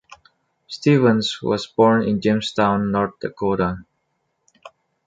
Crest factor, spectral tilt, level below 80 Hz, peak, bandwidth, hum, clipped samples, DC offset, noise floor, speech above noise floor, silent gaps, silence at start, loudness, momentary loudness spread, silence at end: 18 dB; -6.5 dB/octave; -50 dBFS; -4 dBFS; 9 kHz; none; under 0.1%; under 0.1%; -72 dBFS; 53 dB; none; 0.7 s; -19 LUFS; 9 LU; 0.4 s